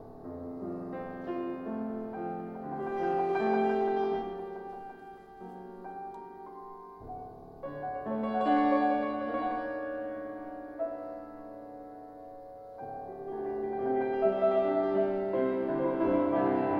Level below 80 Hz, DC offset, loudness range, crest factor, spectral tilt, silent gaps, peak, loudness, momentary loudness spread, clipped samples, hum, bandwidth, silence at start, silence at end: -64 dBFS; under 0.1%; 12 LU; 18 dB; -8.5 dB/octave; none; -14 dBFS; -32 LUFS; 19 LU; under 0.1%; none; 5.6 kHz; 0 s; 0 s